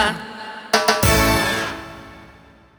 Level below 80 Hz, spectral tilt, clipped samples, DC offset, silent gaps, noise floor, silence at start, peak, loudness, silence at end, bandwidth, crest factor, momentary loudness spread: -34 dBFS; -3.5 dB/octave; under 0.1%; under 0.1%; none; -47 dBFS; 0 s; -2 dBFS; -18 LUFS; 0.45 s; over 20 kHz; 20 dB; 18 LU